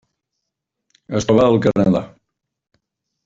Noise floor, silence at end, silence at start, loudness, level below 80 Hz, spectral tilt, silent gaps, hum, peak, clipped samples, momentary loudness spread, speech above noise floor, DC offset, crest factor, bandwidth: -80 dBFS; 1.15 s; 1.1 s; -16 LUFS; -50 dBFS; -7 dB/octave; none; none; -2 dBFS; under 0.1%; 11 LU; 65 dB; under 0.1%; 18 dB; 7.8 kHz